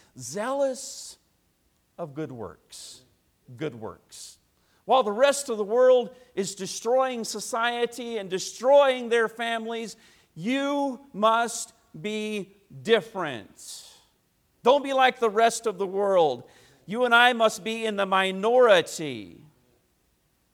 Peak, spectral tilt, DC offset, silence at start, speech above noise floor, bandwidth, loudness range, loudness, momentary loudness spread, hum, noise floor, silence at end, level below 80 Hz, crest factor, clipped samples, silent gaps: -4 dBFS; -3 dB/octave; under 0.1%; 0.15 s; 44 dB; 16 kHz; 11 LU; -24 LUFS; 21 LU; none; -69 dBFS; 1.2 s; -72 dBFS; 20 dB; under 0.1%; none